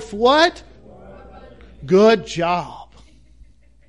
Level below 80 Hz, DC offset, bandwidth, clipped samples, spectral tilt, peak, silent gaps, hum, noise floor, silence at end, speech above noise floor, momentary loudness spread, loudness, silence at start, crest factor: -48 dBFS; 0.3%; 11.5 kHz; under 0.1%; -5 dB/octave; -2 dBFS; none; none; -49 dBFS; 1.05 s; 33 dB; 15 LU; -16 LUFS; 0 s; 18 dB